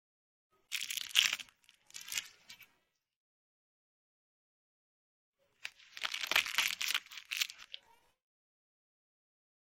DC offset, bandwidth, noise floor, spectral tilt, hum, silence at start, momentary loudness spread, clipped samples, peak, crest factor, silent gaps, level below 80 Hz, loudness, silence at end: under 0.1%; 16.5 kHz; -79 dBFS; 3 dB/octave; none; 0.7 s; 23 LU; under 0.1%; -6 dBFS; 36 dB; 3.16-5.33 s; -80 dBFS; -34 LUFS; 2 s